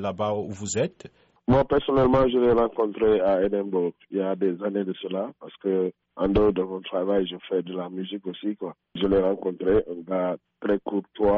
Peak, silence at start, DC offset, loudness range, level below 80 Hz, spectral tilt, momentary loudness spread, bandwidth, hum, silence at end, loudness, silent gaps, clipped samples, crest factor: -12 dBFS; 0 s; under 0.1%; 4 LU; -46 dBFS; -6 dB/octave; 11 LU; 7.6 kHz; none; 0 s; -25 LUFS; none; under 0.1%; 12 dB